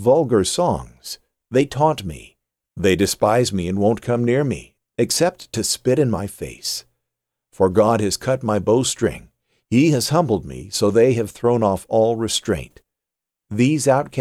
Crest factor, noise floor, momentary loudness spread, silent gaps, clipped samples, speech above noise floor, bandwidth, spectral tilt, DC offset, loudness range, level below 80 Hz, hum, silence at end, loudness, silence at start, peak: 16 dB; -85 dBFS; 12 LU; none; under 0.1%; 67 dB; 16.5 kHz; -5 dB/octave; under 0.1%; 2 LU; -48 dBFS; none; 0 s; -19 LUFS; 0 s; -4 dBFS